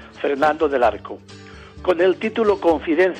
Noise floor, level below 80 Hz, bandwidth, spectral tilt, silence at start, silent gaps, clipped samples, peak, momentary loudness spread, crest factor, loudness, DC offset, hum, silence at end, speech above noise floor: -40 dBFS; -46 dBFS; 9.2 kHz; -6 dB/octave; 0 s; none; under 0.1%; -6 dBFS; 17 LU; 14 dB; -19 LUFS; under 0.1%; none; 0 s; 21 dB